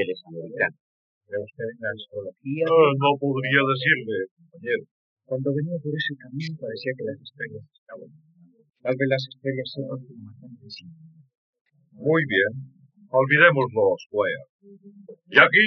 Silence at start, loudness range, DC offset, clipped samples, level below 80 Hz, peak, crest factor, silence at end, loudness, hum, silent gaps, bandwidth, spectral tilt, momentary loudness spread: 0 s; 9 LU; under 0.1%; under 0.1%; -78 dBFS; -2 dBFS; 24 dB; 0 s; -23 LUFS; none; 0.80-1.21 s, 4.31-4.37 s, 4.91-5.17 s, 7.78-7.86 s, 11.37-11.53 s, 11.61-11.65 s, 14.06-14.10 s, 14.49-14.59 s; 6.4 kHz; -3.5 dB/octave; 20 LU